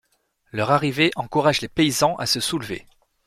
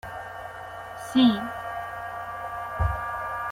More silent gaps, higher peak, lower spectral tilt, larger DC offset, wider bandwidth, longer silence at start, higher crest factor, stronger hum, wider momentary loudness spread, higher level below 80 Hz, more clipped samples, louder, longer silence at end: neither; first, -4 dBFS vs -10 dBFS; second, -4 dB/octave vs -6 dB/octave; neither; about the same, 15.5 kHz vs 16 kHz; first, 0.55 s vs 0.05 s; about the same, 20 dB vs 18 dB; neither; second, 12 LU vs 17 LU; second, -54 dBFS vs -40 dBFS; neither; first, -21 LUFS vs -28 LUFS; first, 0.45 s vs 0 s